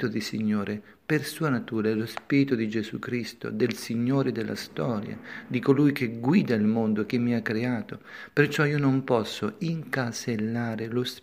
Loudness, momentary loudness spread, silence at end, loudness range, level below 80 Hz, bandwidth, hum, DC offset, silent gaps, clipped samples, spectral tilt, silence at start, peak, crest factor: -27 LUFS; 9 LU; 0.05 s; 3 LU; -66 dBFS; 15.5 kHz; none; under 0.1%; none; under 0.1%; -6.5 dB/octave; 0 s; -6 dBFS; 20 dB